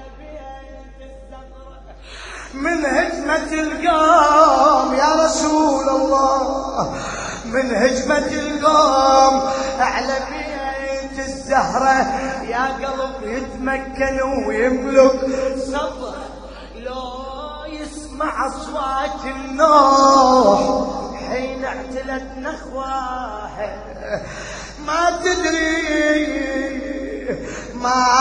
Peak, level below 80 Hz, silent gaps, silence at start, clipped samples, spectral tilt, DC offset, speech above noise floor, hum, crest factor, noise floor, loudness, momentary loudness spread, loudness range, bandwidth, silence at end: 0 dBFS; -40 dBFS; none; 0 s; under 0.1%; -3.5 dB/octave; under 0.1%; 21 dB; none; 18 dB; -38 dBFS; -18 LUFS; 18 LU; 11 LU; 10 kHz; 0 s